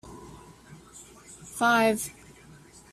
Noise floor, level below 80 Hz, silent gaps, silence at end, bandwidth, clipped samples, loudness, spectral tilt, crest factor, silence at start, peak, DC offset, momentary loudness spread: -52 dBFS; -60 dBFS; none; 0.8 s; 15.5 kHz; under 0.1%; -25 LUFS; -3.5 dB/octave; 20 dB; 0.05 s; -10 dBFS; under 0.1%; 26 LU